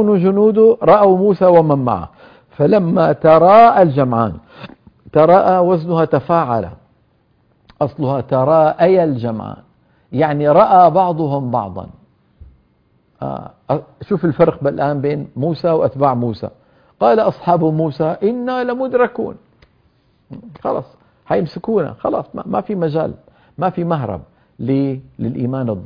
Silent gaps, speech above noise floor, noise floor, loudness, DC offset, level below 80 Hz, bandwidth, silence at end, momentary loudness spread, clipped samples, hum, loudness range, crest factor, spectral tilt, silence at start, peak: none; 43 dB; -57 dBFS; -14 LUFS; under 0.1%; -50 dBFS; 5.2 kHz; 0 s; 16 LU; under 0.1%; none; 9 LU; 16 dB; -10.5 dB/octave; 0 s; 0 dBFS